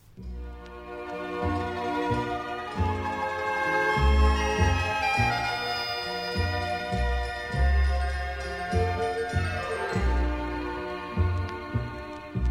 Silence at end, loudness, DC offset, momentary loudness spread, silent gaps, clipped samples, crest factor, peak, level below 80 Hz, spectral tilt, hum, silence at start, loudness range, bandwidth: 0 s; -28 LUFS; under 0.1%; 11 LU; none; under 0.1%; 16 dB; -10 dBFS; -32 dBFS; -6 dB/octave; none; 0.1 s; 5 LU; 13.5 kHz